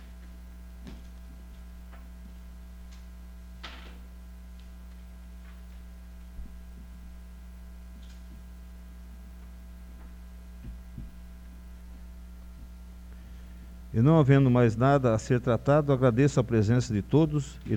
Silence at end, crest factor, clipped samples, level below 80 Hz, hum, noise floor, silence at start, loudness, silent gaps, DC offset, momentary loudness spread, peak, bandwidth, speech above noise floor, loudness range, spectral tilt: 0 s; 22 dB; under 0.1%; -44 dBFS; none; -45 dBFS; 0 s; -24 LUFS; none; under 0.1%; 25 LU; -8 dBFS; 15 kHz; 22 dB; 23 LU; -8 dB/octave